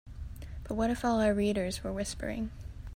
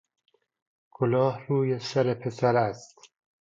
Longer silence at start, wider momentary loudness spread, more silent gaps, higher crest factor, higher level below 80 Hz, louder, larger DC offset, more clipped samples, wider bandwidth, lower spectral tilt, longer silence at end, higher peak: second, 0.05 s vs 1 s; first, 17 LU vs 6 LU; neither; about the same, 16 dB vs 18 dB; first, -44 dBFS vs -70 dBFS; second, -32 LUFS vs -26 LUFS; neither; neither; first, 16 kHz vs 7.8 kHz; second, -5.5 dB/octave vs -7 dB/octave; second, 0 s vs 0.55 s; second, -16 dBFS vs -10 dBFS